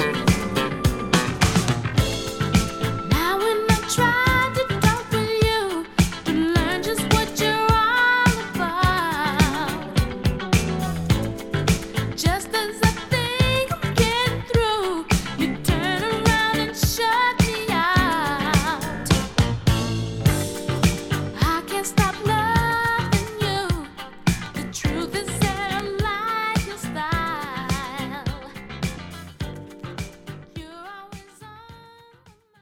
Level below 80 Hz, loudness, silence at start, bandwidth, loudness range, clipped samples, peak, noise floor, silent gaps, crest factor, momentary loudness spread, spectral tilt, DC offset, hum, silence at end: -34 dBFS; -22 LUFS; 0 s; 17.5 kHz; 9 LU; under 0.1%; -2 dBFS; -54 dBFS; none; 20 dB; 11 LU; -4.5 dB/octave; under 0.1%; none; 0.75 s